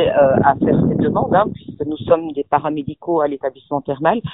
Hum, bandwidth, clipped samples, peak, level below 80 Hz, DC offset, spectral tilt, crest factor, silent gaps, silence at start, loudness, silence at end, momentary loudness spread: none; 4 kHz; under 0.1%; 0 dBFS; -44 dBFS; under 0.1%; -6.5 dB/octave; 16 dB; none; 0 s; -18 LUFS; 0 s; 12 LU